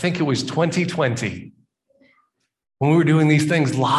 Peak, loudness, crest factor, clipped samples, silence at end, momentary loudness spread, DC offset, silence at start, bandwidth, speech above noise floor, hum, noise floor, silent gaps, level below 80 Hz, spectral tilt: -4 dBFS; -19 LUFS; 16 dB; under 0.1%; 0 s; 9 LU; under 0.1%; 0 s; 12 kHz; 49 dB; none; -67 dBFS; none; -56 dBFS; -6 dB/octave